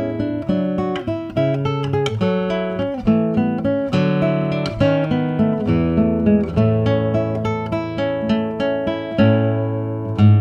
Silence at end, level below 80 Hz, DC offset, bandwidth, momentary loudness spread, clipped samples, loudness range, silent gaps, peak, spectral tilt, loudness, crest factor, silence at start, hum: 0 s; -40 dBFS; under 0.1%; 7.4 kHz; 6 LU; under 0.1%; 2 LU; none; -2 dBFS; -8.5 dB/octave; -19 LUFS; 16 dB; 0 s; none